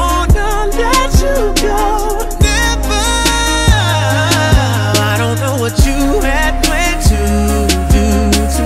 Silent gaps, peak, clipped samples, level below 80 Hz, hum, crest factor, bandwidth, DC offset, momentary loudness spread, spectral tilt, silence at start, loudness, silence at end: none; 0 dBFS; under 0.1%; -16 dBFS; none; 10 dB; 16.5 kHz; under 0.1%; 3 LU; -4.5 dB/octave; 0 s; -12 LUFS; 0 s